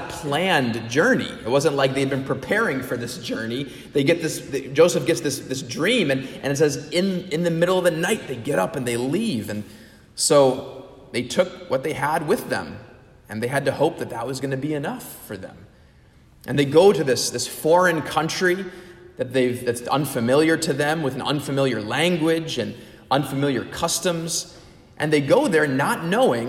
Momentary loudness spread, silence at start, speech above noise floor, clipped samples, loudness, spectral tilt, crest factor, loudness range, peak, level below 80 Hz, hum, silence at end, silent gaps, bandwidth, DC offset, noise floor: 12 LU; 0 s; 30 dB; under 0.1%; -22 LUFS; -4.5 dB/octave; 18 dB; 5 LU; -4 dBFS; -56 dBFS; none; 0 s; none; 16 kHz; under 0.1%; -52 dBFS